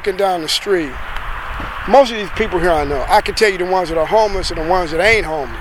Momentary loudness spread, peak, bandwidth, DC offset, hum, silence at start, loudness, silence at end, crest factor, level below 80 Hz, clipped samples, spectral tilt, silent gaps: 13 LU; 0 dBFS; 17 kHz; under 0.1%; none; 0 s; -16 LUFS; 0 s; 16 dB; -28 dBFS; under 0.1%; -4 dB/octave; none